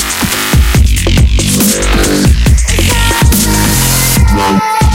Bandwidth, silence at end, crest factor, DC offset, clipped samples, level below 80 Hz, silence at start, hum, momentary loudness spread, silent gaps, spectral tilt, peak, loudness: 17 kHz; 0 s; 8 dB; under 0.1%; 0.1%; -12 dBFS; 0 s; none; 2 LU; none; -4 dB/octave; 0 dBFS; -9 LUFS